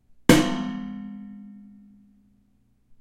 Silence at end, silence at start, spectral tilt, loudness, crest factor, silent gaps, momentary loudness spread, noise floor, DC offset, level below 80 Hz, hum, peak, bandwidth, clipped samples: 1.4 s; 0.3 s; -5 dB/octave; -22 LUFS; 26 dB; none; 25 LU; -63 dBFS; under 0.1%; -46 dBFS; none; -2 dBFS; 16 kHz; under 0.1%